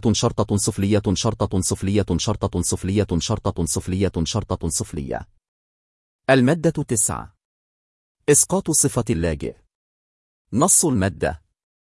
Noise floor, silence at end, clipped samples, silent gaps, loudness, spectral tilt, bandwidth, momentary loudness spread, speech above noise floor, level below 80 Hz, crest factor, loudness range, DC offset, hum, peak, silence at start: under -90 dBFS; 0.5 s; under 0.1%; 5.48-6.19 s, 7.45-8.15 s, 9.75-10.45 s; -20 LUFS; -4.5 dB/octave; 12 kHz; 12 LU; over 70 dB; -42 dBFS; 18 dB; 4 LU; under 0.1%; none; -4 dBFS; 0.05 s